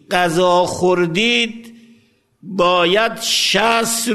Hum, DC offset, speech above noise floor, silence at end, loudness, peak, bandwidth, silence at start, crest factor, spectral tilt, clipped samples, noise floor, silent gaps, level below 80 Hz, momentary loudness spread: none; under 0.1%; 39 dB; 0 s; -15 LUFS; 0 dBFS; 13.5 kHz; 0.1 s; 16 dB; -3 dB/octave; under 0.1%; -55 dBFS; none; -52 dBFS; 4 LU